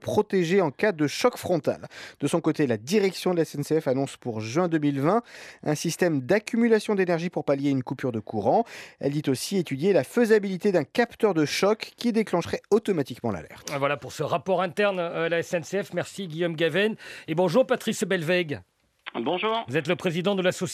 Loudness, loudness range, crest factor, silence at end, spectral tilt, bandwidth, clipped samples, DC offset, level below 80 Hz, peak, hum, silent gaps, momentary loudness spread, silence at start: -25 LUFS; 3 LU; 18 dB; 0 s; -5.5 dB/octave; 14.5 kHz; under 0.1%; under 0.1%; -68 dBFS; -8 dBFS; none; none; 9 LU; 0 s